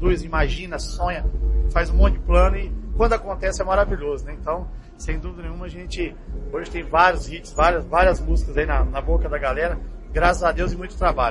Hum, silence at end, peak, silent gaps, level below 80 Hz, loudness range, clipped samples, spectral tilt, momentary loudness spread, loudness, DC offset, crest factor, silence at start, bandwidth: none; 0 s; -2 dBFS; none; -24 dBFS; 5 LU; under 0.1%; -6 dB/octave; 12 LU; -22 LUFS; under 0.1%; 20 dB; 0 s; 10.5 kHz